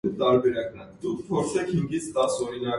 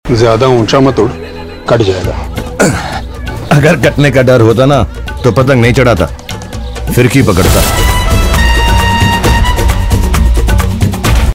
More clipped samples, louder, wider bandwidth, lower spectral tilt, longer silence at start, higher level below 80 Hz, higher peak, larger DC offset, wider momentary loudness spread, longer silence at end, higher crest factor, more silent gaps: second, under 0.1% vs 1%; second, -26 LUFS vs -9 LUFS; second, 11.5 kHz vs 16.5 kHz; about the same, -5.5 dB/octave vs -5.5 dB/octave; about the same, 0.05 s vs 0.05 s; second, -56 dBFS vs -14 dBFS; second, -10 dBFS vs 0 dBFS; second, under 0.1% vs 0.5%; about the same, 11 LU vs 13 LU; about the same, 0 s vs 0 s; first, 16 dB vs 8 dB; neither